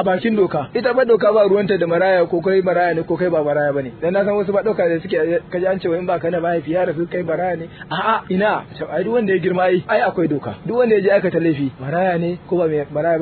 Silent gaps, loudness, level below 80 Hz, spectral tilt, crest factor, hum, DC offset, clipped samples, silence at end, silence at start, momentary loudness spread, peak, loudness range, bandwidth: none; -18 LUFS; -52 dBFS; -10.5 dB/octave; 14 dB; none; under 0.1%; under 0.1%; 0 s; 0 s; 7 LU; -2 dBFS; 4 LU; 4.5 kHz